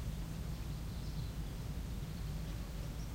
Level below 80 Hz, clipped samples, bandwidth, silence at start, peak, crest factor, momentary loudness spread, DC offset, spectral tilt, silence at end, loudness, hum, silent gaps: -44 dBFS; under 0.1%; 16 kHz; 0 s; -30 dBFS; 12 dB; 1 LU; under 0.1%; -6 dB/octave; 0 s; -44 LUFS; none; none